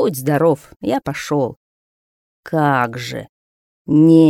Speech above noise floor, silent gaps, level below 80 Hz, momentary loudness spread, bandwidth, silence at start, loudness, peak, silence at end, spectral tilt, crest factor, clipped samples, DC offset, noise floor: over 75 dB; 0.76-0.80 s, 1.57-2.43 s, 3.29-3.85 s; -54 dBFS; 13 LU; 15 kHz; 0 s; -18 LUFS; 0 dBFS; 0 s; -7 dB/octave; 16 dB; under 0.1%; under 0.1%; under -90 dBFS